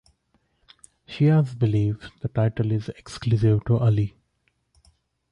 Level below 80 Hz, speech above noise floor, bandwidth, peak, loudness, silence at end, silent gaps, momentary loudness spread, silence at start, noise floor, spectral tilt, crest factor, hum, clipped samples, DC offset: -48 dBFS; 49 dB; 10 kHz; -10 dBFS; -23 LUFS; 1.25 s; none; 11 LU; 1.1 s; -71 dBFS; -8.5 dB/octave; 14 dB; none; under 0.1%; under 0.1%